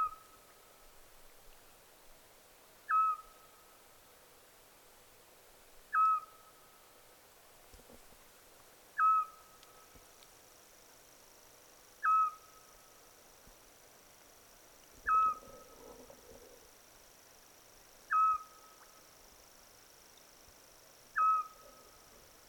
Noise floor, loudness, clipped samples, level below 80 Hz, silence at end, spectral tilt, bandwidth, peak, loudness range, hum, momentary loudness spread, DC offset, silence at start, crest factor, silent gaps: -61 dBFS; -32 LUFS; under 0.1%; -70 dBFS; 1 s; -1 dB/octave; 19 kHz; -22 dBFS; 2 LU; none; 28 LU; under 0.1%; 0 s; 18 dB; none